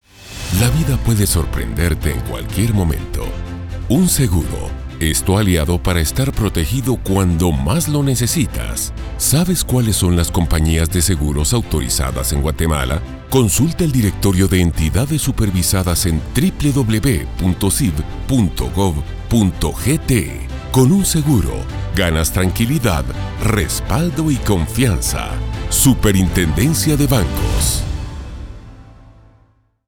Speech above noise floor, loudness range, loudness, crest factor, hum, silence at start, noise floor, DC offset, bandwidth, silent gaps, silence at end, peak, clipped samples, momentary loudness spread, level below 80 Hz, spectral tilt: 39 dB; 2 LU; -16 LUFS; 16 dB; none; 0.2 s; -55 dBFS; under 0.1%; 19 kHz; none; 0.85 s; 0 dBFS; under 0.1%; 9 LU; -24 dBFS; -5 dB/octave